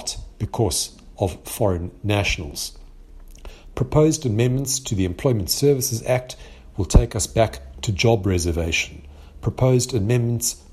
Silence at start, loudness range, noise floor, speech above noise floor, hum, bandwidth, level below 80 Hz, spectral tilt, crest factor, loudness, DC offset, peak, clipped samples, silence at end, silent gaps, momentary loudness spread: 0 s; 4 LU; -42 dBFS; 21 dB; none; 15.5 kHz; -32 dBFS; -5 dB/octave; 22 dB; -22 LUFS; under 0.1%; 0 dBFS; under 0.1%; 0.15 s; none; 11 LU